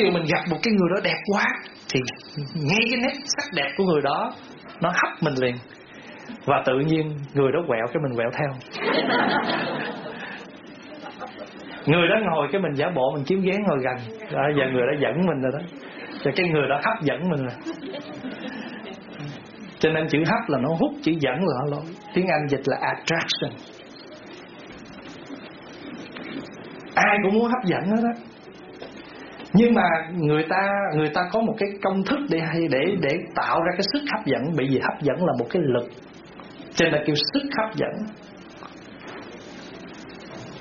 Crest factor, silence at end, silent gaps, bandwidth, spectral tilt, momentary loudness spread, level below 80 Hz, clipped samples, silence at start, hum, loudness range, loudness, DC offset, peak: 18 dB; 0 s; none; 7 kHz; -4 dB/octave; 19 LU; -58 dBFS; under 0.1%; 0 s; none; 5 LU; -23 LUFS; under 0.1%; -6 dBFS